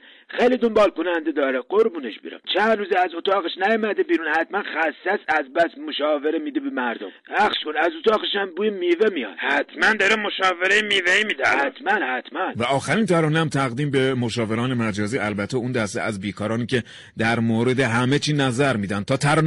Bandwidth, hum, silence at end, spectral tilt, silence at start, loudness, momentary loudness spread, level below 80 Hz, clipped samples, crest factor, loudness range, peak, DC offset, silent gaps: 11.5 kHz; none; 0 s; -5 dB/octave; 0.3 s; -21 LUFS; 7 LU; -58 dBFS; under 0.1%; 14 dB; 4 LU; -8 dBFS; under 0.1%; none